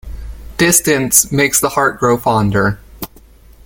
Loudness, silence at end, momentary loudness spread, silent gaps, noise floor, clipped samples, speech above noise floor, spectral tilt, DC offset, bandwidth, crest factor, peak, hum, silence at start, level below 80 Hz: -12 LUFS; 0.6 s; 20 LU; none; -42 dBFS; under 0.1%; 29 dB; -3.5 dB/octave; under 0.1%; 17 kHz; 16 dB; 0 dBFS; none; 0.05 s; -34 dBFS